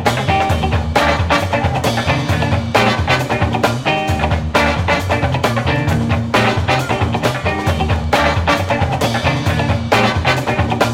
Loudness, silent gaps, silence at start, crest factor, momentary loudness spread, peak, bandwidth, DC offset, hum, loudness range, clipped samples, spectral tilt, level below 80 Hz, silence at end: -15 LUFS; none; 0 s; 16 dB; 3 LU; 0 dBFS; 16.5 kHz; under 0.1%; none; 1 LU; under 0.1%; -5.5 dB/octave; -28 dBFS; 0 s